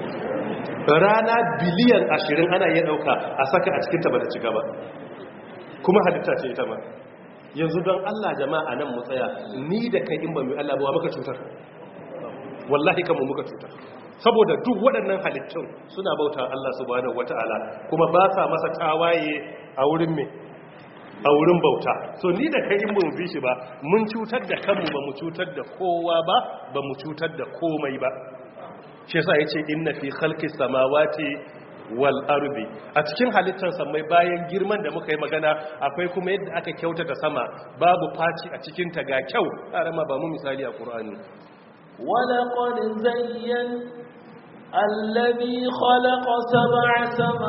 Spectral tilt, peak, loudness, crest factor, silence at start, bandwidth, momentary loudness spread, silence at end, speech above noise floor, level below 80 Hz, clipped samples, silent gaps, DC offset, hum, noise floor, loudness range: -4 dB/octave; -2 dBFS; -23 LUFS; 20 dB; 0 s; 5.8 kHz; 17 LU; 0 s; 22 dB; -66 dBFS; under 0.1%; none; under 0.1%; none; -44 dBFS; 5 LU